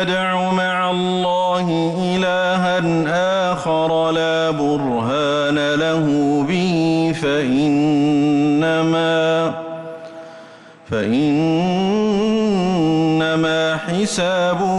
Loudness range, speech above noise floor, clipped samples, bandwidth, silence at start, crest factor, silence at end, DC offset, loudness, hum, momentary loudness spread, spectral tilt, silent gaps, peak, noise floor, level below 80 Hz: 3 LU; 24 dB; under 0.1%; 11.5 kHz; 0 s; 8 dB; 0 s; under 0.1%; -17 LUFS; none; 4 LU; -6 dB/octave; none; -8 dBFS; -41 dBFS; -52 dBFS